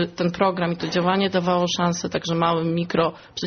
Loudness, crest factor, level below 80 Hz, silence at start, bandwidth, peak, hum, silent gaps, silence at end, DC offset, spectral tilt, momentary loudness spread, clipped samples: -22 LUFS; 14 dB; -56 dBFS; 0 s; 6.6 kHz; -8 dBFS; none; none; 0 s; under 0.1%; -4.5 dB/octave; 4 LU; under 0.1%